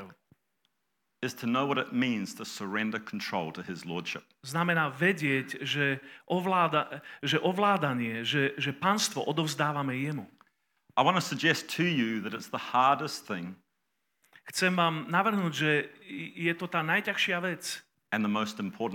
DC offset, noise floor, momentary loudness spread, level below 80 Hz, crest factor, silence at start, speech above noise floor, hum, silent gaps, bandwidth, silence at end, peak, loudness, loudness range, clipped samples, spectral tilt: under 0.1%; -81 dBFS; 11 LU; -82 dBFS; 22 dB; 0 s; 52 dB; none; none; 17.5 kHz; 0 s; -10 dBFS; -29 LUFS; 4 LU; under 0.1%; -4.5 dB/octave